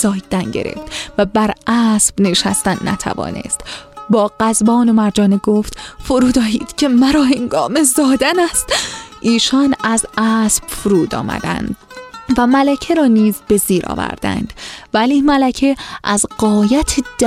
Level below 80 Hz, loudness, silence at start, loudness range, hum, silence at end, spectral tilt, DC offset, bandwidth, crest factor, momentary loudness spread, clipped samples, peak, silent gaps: -38 dBFS; -14 LUFS; 0 s; 2 LU; none; 0 s; -4 dB/octave; under 0.1%; 16 kHz; 14 dB; 10 LU; under 0.1%; 0 dBFS; none